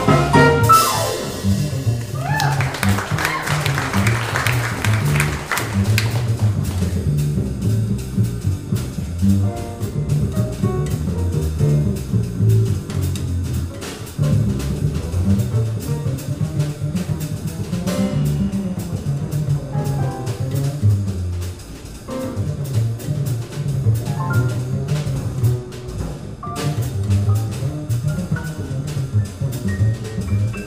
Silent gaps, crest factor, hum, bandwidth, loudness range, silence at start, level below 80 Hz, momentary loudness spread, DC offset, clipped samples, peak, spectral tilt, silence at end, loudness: none; 18 dB; none; 16 kHz; 4 LU; 0 s; -34 dBFS; 7 LU; under 0.1%; under 0.1%; -2 dBFS; -6 dB/octave; 0 s; -20 LUFS